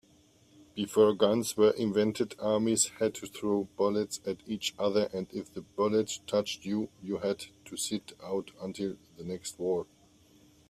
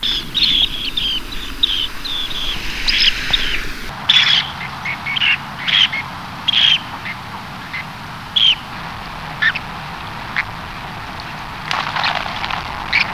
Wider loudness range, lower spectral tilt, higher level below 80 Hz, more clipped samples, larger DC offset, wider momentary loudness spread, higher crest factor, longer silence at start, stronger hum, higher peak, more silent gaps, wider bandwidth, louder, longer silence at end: about the same, 8 LU vs 8 LU; first, -4 dB/octave vs -2 dB/octave; second, -68 dBFS vs -36 dBFS; neither; second, under 0.1% vs 0.5%; second, 13 LU vs 16 LU; about the same, 20 dB vs 18 dB; first, 0.75 s vs 0 s; neither; second, -12 dBFS vs 0 dBFS; neither; about the same, 15.5 kHz vs 16 kHz; second, -31 LUFS vs -16 LUFS; first, 0.85 s vs 0 s